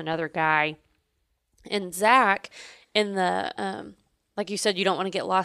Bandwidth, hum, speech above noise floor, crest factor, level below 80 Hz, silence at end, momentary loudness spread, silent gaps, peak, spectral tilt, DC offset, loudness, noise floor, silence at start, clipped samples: 15 kHz; none; 49 dB; 22 dB; -68 dBFS; 0 s; 15 LU; none; -6 dBFS; -3.5 dB/octave; under 0.1%; -25 LUFS; -74 dBFS; 0 s; under 0.1%